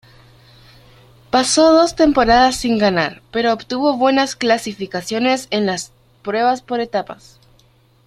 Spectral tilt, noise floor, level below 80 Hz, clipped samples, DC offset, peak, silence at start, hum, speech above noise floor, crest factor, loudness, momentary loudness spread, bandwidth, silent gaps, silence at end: -3.5 dB/octave; -53 dBFS; -44 dBFS; under 0.1%; under 0.1%; -2 dBFS; 1.35 s; none; 37 dB; 16 dB; -16 LUFS; 12 LU; 13.5 kHz; none; 0.9 s